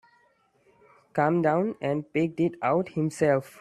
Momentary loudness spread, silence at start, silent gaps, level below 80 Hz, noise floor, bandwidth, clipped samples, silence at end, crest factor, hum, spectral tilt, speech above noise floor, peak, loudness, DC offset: 6 LU; 1.15 s; none; -66 dBFS; -65 dBFS; 13 kHz; under 0.1%; 0.1 s; 18 dB; none; -7.5 dB/octave; 40 dB; -8 dBFS; -26 LUFS; under 0.1%